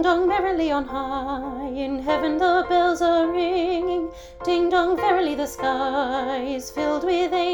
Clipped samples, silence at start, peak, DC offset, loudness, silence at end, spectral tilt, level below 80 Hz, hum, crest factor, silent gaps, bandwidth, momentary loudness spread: under 0.1%; 0 s; -8 dBFS; under 0.1%; -22 LUFS; 0 s; -4.5 dB/octave; -46 dBFS; none; 14 dB; none; 19 kHz; 9 LU